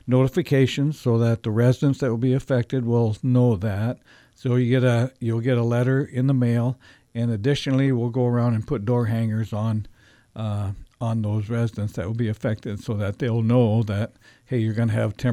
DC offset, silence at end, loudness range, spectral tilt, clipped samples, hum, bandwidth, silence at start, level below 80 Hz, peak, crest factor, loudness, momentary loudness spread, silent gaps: under 0.1%; 0 s; 5 LU; -8 dB/octave; under 0.1%; none; 10.5 kHz; 0.05 s; -52 dBFS; -6 dBFS; 16 dB; -23 LUFS; 9 LU; none